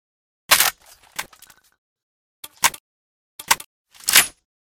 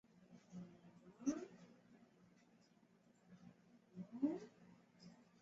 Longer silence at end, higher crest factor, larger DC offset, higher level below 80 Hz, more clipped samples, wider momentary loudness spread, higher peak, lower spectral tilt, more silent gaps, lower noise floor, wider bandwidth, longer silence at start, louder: first, 0.5 s vs 0.2 s; about the same, 24 dB vs 24 dB; neither; first, -58 dBFS vs -88 dBFS; neither; second, 19 LU vs 24 LU; first, 0 dBFS vs -28 dBFS; second, 2 dB/octave vs -7.5 dB/octave; first, 1.78-1.96 s, 2.03-2.43 s, 2.80-3.39 s, 3.66-3.85 s vs none; second, -51 dBFS vs -73 dBFS; first, over 20 kHz vs 7.6 kHz; first, 0.5 s vs 0.15 s; first, -18 LUFS vs -48 LUFS